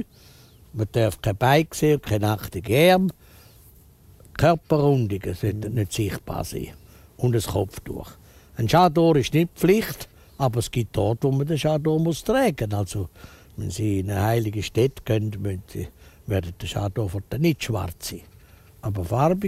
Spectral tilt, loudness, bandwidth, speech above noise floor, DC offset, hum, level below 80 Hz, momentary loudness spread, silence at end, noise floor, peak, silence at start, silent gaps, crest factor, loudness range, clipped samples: -6 dB/octave; -23 LUFS; 16 kHz; 29 dB; under 0.1%; none; -44 dBFS; 16 LU; 0 s; -51 dBFS; -4 dBFS; 0 s; none; 20 dB; 6 LU; under 0.1%